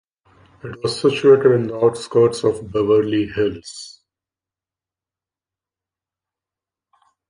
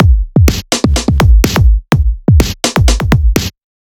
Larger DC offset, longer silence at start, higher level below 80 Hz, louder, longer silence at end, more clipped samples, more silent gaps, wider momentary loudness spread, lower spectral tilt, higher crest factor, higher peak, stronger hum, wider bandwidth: neither; first, 0.65 s vs 0 s; second, -54 dBFS vs -12 dBFS; second, -17 LUFS vs -11 LUFS; first, 3.4 s vs 0.35 s; neither; neither; first, 21 LU vs 4 LU; about the same, -6 dB/octave vs -5.5 dB/octave; first, 18 dB vs 10 dB; about the same, -2 dBFS vs 0 dBFS; neither; second, 10.5 kHz vs over 20 kHz